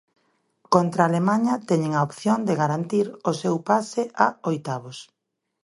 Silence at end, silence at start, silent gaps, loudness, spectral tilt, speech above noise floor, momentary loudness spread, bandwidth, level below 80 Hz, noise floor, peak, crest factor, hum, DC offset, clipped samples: 0.6 s; 0.7 s; none; -23 LUFS; -6.5 dB/octave; 57 dB; 8 LU; 11.5 kHz; -68 dBFS; -80 dBFS; -2 dBFS; 22 dB; none; under 0.1%; under 0.1%